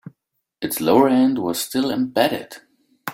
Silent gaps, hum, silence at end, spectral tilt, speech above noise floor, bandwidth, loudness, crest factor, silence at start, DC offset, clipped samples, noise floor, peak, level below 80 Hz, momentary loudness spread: none; none; 0 s; -4.5 dB/octave; 57 dB; 16.5 kHz; -19 LUFS; 18 dB; 0.05 s; under 0.1%; under 0.1%; -76 dBFS; -2 dBFS; -62 dBFS; 15 LU